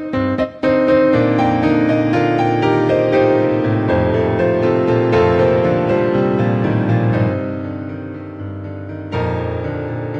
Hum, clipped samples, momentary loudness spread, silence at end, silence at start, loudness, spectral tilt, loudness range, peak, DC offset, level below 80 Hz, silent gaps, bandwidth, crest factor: none; under 0.1%; 13 LU; 0 s; 0 s; -16 LUFS; -9 dB/octave; 5 LU; -2 dBFS; under 0.1%; -42 dBFS; none; 7.2 kHz; 12 dB